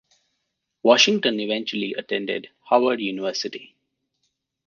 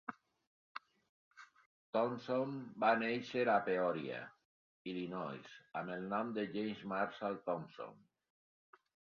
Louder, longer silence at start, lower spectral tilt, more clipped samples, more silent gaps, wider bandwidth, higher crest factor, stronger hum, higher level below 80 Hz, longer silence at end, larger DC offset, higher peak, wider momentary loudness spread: first, -22 LUFS vs -39 LUFS; first, 0.85 s vs 0.1 s; about the same, -3 dB/octave vs -4 dB/octave; neither; second, none vs 0.47-0.75 s, 1.09-1.31 s, 1.66-1.93 s, 4.45-4.85 s; about the same, 7.4 kHz vs 7 kHz; about the same, 22 dB vs 22 dB; neither; first, -76 dBFS vs -82 dBFS; second, 1 s vs 1.2 s; neither; first, -2 dBFS vs -20 dBFS; second, 14 LU vs 18 LU